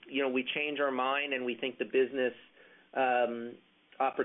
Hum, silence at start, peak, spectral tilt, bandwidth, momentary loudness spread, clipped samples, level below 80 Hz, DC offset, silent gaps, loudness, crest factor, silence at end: none; 0.05 s; -18 dBFS; -7.5 dB/octave; 3.9 kHz; 6 LU; under 0.1%; -80 dBFS; under 0.1%; none; -32 LUFS; 16 dB; 0 s